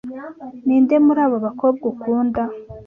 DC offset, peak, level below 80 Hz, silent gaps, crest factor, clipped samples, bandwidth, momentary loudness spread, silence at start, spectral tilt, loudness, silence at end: under 0.1%; -4 dBFS; -52 dBFS; none; 14 dB; under 0.1%; 3.3 kHz; 16 LU; 0.05 s; -10 dB/octave; -18 LUFS; 0.05 s